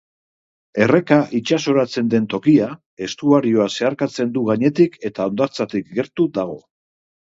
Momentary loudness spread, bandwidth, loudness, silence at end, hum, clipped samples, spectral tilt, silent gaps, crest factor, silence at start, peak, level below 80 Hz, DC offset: 10 LU; 7.8 kHz; -18 LUFS; 0.8 s; none; under 0.1%; -6.5 dB/octave; 2.86-2.97 s; 18 dB; 0.75 s; 0 dBFS; -62 dBFS; under 0.1%